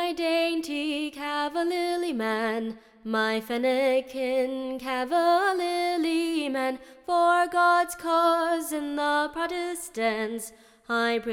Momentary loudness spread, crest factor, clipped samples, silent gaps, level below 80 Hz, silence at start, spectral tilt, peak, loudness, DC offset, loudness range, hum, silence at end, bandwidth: 9 LU; 14 dB; under 0.1%; none; -64 dBFS; 0 s; -3 dB/octave; -12 dBFS; -26 LUFS; under 0.1%; 4 LU; none; 0 s; 17 kHz